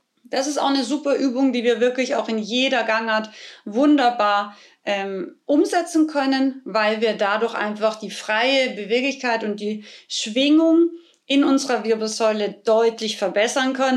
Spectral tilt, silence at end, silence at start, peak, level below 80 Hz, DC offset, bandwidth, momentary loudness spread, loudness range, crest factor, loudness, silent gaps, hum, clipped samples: -3.5 dB/octave; 0 s; 0.3 s; -6 dBFS; -76 dBFS; under 0.1%; 12.5 kHz; 9 LU; 2 LU; 14 dB; -20 LUFS; none; none; under 0.1%